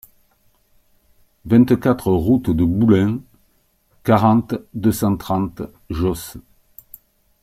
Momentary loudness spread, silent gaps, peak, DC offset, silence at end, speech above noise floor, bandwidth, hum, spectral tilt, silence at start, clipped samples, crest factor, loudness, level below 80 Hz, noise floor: 14 LU; none; -2 dBFS; under 0.1%; 1 s; 44 dB; 16 kHz; none; -7.5 dB/octave; 1.45 s; under 0.1%; 18 dB; -18 LUFS; -42 dBFS; -61 dBFS